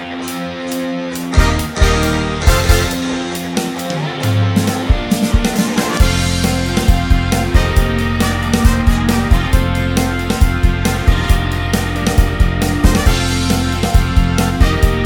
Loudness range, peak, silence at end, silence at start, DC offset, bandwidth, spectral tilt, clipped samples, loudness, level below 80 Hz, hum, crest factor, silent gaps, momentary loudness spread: 1 LU; 0 dBFS; 0 s; 0 s; under 0.1%; 19 kHz; -5 dB/octave; 0.2%; -15 LUFS; -18 dBFS; none; 14 dB; none; 6 LU